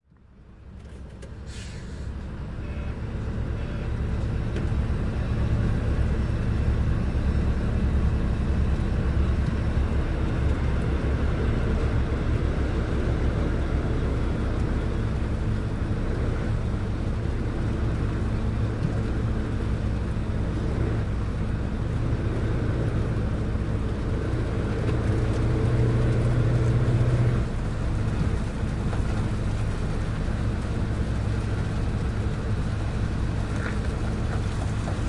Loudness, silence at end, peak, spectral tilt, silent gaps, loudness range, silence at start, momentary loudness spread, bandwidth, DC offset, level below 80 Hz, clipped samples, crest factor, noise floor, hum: -27 LUFS; 0 s; -10 dBFS; -8 dB/octave; none; 4 LU; 0.4 s; 5 LU; 11 kHz; under 0.1%; -28 dBFS; under 0.1%; 14 dB; -51 dBFS; none